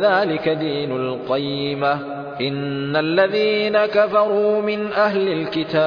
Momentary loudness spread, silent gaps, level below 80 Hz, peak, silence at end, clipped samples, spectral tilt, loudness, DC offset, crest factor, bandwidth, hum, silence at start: 7 LU; none; -60 dBFS; -4 dBFS; 0 s; under 0.1%; -7.5 dB/octave; -20 LUFS; under 0.1%; 16 dB; 5.4 kHz; none; 0 s